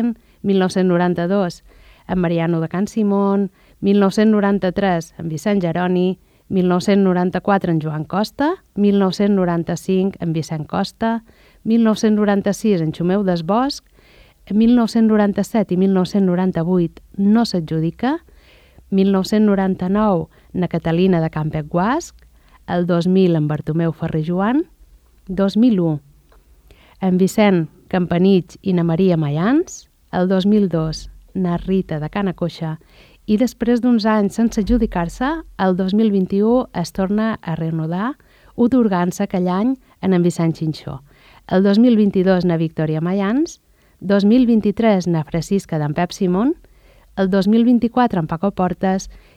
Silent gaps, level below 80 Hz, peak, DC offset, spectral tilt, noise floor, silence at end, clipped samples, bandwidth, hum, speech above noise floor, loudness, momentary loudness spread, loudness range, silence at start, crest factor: none; -44 dBFS; -2 dBFS; under 0.1%; -7.5 dB/octave; -50 dBFS; 0.2 s; under 0.1%; 13.5 kHz; none; 33 dB; -18 LUFS; 9 LU; 2 LU; 0 s; 14 dB